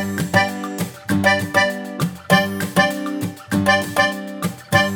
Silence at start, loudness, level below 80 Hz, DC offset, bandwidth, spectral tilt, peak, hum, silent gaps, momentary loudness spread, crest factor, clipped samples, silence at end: 0 s; -19 LUFS; -54 dBFS; under 0.1%; over 20 kHz; -4.5 dB/octave; 0 dBFS; none; none; 10 LU; 18 dB; under 0.1%; 0 s